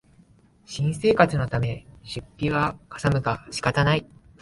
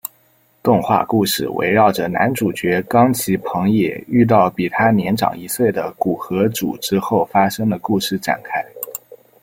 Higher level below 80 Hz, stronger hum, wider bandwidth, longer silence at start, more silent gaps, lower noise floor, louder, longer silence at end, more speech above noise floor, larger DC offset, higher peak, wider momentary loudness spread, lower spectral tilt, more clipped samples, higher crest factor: first, -46 dBFS vs -54 dBFS; neither; second, 11.5 kHz vs 16.5 kHz; first, 0.7 s vs 0.05 s; neither; about the same, -56 dBFS vs -57 dBFS; second, -24 LUFS vs -17 LUFS; about the same, 0.4 s vs 0.3 s; second, 32 dB vs 40 dB; neither; about the same, -2 dBFS vs -2 dBFS; first, 16 LU vs 8 LU; about the same, -6 dB/octave vs -5.5 dB/octave; neither; first, 22 dB vs 16 dB